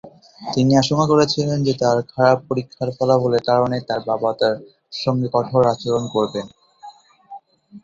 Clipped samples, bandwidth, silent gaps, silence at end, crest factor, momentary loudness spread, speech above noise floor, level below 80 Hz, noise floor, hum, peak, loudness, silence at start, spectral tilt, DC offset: under 0.1%; 7.8 kHz; none; 0.05 s; 18 dB; 10 LU; 25 dB; -56 dBFS; -43 dBFS; none; -2 dBFS; -19 LUFS; 0.05 s; -6 dB/octave; under 0.1%